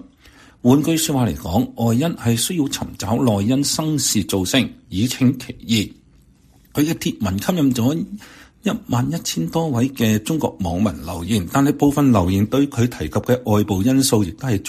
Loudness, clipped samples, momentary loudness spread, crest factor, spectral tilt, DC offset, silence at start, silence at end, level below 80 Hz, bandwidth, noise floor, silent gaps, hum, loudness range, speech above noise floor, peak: -19 LUFS; under 0.1%; 7 LU; 18 dB; -5 dB/octave; under 0.1%; 0.65 s; 0 s; -44 dBFS; 15.5 kHz; -52 dBFS; none; none; 4 LU; 33 dB; -2 dBFS